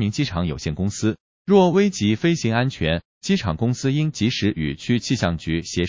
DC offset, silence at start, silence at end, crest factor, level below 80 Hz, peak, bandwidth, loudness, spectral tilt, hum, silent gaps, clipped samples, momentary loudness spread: under 0.1%; 0 s; 0 s; 18 dB; -40 dBFS; -2 dBFS; 7.6 kHz; -21 LUFS; -6 dB/octave; none; 1.20-1.45 s, 3.05-3.21 s; under 0.1%; 8 LU